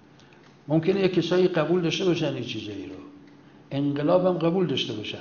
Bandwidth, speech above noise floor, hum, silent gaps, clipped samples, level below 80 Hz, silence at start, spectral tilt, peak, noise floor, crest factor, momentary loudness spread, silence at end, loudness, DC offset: 7 kHz; 28 dB; none; none; under 0.1%; -62 dBFS; 0.7 s; -6.5 dB/octave; -8 dBFS; -52 dBFS; 16 dB; 12 LU; 0 s; -24 LUFS; under 0.1%